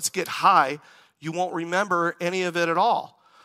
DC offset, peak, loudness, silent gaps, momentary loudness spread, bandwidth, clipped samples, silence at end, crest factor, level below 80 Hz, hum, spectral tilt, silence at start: under 0.1%; -4 dBFS; -23 LUFS; none; 11 LU; 16 kHz; under 0.1%; 0.35 s; 20 dB; -80 dBFS; none; -3.5 dB/octave; 0 s